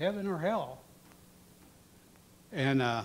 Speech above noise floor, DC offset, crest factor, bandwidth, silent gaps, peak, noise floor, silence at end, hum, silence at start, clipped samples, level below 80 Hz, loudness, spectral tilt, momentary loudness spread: 28 dB; under 0.1%; 18 dB; 16 kHz; none; -16 dBFS; -59 dBFS; 0 s; none; 0 s; under 0.1%; -68 dBFS; -33 LUFS; -6.5 dB/octave; 14 LU